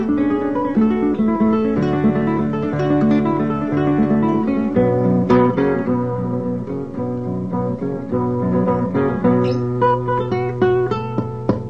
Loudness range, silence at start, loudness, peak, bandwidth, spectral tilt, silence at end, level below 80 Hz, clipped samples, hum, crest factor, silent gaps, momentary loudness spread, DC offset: 4 LU; 0 s; -18 LUFS; -2 dBFS; 6.6 kHz; -9.5 dB/octave; 0 s; -44 dBFS; under 0.1%; none; 16 dB; none; 7 LU; 0.8%